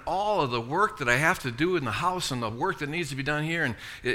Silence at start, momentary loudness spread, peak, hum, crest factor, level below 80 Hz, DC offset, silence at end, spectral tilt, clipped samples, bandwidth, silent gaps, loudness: 0 s; 7 LU; -6 dBFS; none; 20 dB; -52 dBFS; under 0.1%; 0 s; -4.5 dB/octave; under 0.1%; 17.5 kHz; none; -27 LUFS